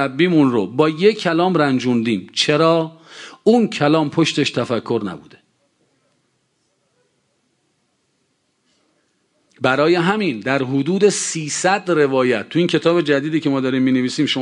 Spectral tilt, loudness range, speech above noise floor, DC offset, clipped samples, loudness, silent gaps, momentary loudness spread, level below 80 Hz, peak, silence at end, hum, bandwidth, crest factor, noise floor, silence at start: -5 dB/octave; 8 LU; 50 dB; under 0.1%; under 0.1%; -17 LUFS; none; 6 LU; -64 dBFS; -2 dBFS; 0 s; none; 11 kHz; 16 dB; -67 dBFS; 0 s